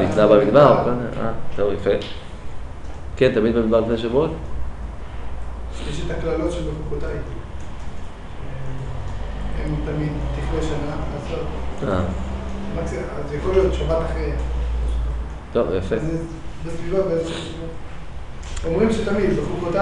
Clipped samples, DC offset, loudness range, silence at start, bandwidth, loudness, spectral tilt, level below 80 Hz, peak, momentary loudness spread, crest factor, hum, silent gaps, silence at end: under 0.1%; under 0.1%; 7 LU; 0 s; 10.5 kHz; -22 LUFS; -7 dB/octave; -30 dBFS; -2 dBFS; 17 LU; 20 dB; none; none; 0 s